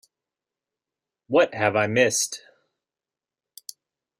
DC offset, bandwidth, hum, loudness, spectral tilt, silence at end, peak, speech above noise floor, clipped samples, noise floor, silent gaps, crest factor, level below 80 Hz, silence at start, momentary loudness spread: under 0.1%; 16 kHz; none; -22 LUFS; -3 dB/octave; 1.8 s; -4 dBFS; over 69 dB; under 0.1%; under -90 dBFS; none; 24 dB; -70 dBFS; 1.3 s; 22 LU